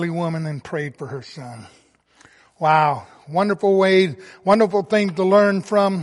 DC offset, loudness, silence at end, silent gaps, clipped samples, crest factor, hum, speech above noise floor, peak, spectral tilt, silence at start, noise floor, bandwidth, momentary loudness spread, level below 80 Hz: under 0.1%; -19 LUFS; 0 s; none; under 0.1%; 16 dB; none; 35 dB; -2 dBFS; -6.5 dB/octave; 0 s; -54 dBFS; 11.5 kHz; 17 LU; -66 dBFS